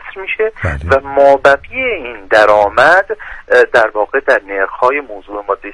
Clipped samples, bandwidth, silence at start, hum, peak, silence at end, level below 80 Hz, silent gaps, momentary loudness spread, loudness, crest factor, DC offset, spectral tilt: 0.2%; 11 kHz; 0.05 s; none; 0 dBFS; 0 s; -36 dBFS; none; 12 LU; -12 LUFS; 12 dB; under 0.1%; -5 dB/octave